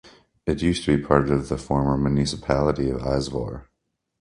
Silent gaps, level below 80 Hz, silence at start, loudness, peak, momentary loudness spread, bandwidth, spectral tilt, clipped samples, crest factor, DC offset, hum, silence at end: none; -38 dBFS; 0.05 s; -23 LUFS; 0 dBFS; 10 LU; 11 kHz; -6.5 dB/octave; under 0.1%; 22 dB; under 0.1%; none; 0.55 s